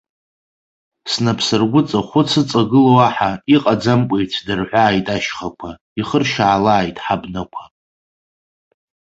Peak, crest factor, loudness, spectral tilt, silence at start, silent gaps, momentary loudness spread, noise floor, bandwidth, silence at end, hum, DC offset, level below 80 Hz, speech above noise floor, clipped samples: -2 dBFS; 16 dB; -16 LUFS; -5.5 dB/octave; 1.05 s; 5.81-5.96 s; 14 LU; under -90 dBFS; 8.2 kHz; 1.55 s; none; under 0.1%; -48 dBFS; over 74 dB; under 0.1%